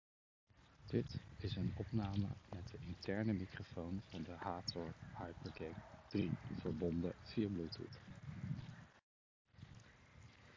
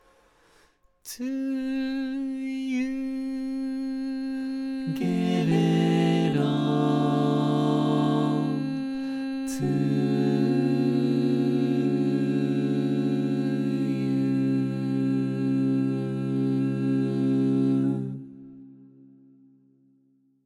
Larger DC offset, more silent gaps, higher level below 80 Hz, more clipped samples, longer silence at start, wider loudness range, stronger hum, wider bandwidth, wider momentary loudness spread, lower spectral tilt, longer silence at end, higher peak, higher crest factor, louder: neither; first, 9.03-9.45 s vs none; about the same, -60 dBFS vs -64 dBFS; neither; second, 0.55 s vs 1.05 s; second, 3 LU vs 6 LU; neither; second, 7.6 kHz vs 13 kHz; first, 19 LU vs 8 LU; about the same, -7.5 dB/octave vs -7.5 dB/octave; second, 0 s vs 1.7 s; second, -24 dBFS vs -10 dBFS; about the same, 20 dB vs 16 dB; second, -45 LUFS vs -26 LUFS